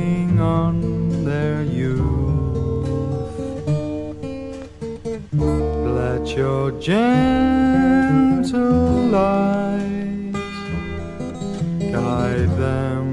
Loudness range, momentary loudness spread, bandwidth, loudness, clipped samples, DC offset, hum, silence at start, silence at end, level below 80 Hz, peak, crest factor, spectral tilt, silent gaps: 7 LU; 12 LU; 11 kHz; -20 LUFS; under 0.1%; under 0.1%; none; 0 s; 0 s; -34 dBFS; -4 dBFS; 16 dB; -8 dB/octave; none